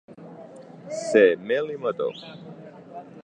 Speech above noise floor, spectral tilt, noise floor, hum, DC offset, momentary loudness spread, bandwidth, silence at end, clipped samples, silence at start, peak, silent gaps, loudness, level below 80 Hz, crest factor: 21 dB; -5 dB/octave; -44 dBFS; none; under 0.1%; 25 LU; 9.8 kHz; 0.05 s; under 0.1%; 0.1 s; -4 dBFS; none; -23 LUFS; -76 dBFS; 22 dB